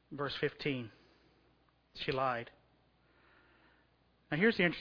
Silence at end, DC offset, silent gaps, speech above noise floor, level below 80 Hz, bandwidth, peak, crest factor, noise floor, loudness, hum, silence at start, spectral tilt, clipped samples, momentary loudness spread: 0 s; under 0.1%; none; 36 dB; -68 dBFS; 5.4 kHz; -16 dBFS; 24 dB; -71 dBFS; -35 LUFS; none; 0.1 s; -3.5 dB/octave; under 0.1%; 20 LU